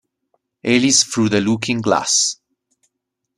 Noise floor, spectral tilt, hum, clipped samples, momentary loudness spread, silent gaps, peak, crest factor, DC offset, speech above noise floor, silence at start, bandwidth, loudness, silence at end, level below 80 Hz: -78 dBFS; -3 dB/octave; none; under 0.1%; 7 LU; none; 0 dBFS; 18 dB; under 0.1%; 61 dB; 0.65 s; 13 kHz; -16 LUFS; 1.05 s; -58 dBFS